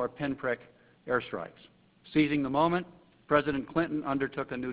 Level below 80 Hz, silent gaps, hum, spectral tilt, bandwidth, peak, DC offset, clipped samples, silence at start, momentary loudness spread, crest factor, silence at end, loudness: -60 dBFS; none; none; -5 dB/octave; 4 kHz; -10 dBFS; under 0.1%; under 0.1%; 0 s; 12 LU; 22 dB; 0 s; -30 LUFS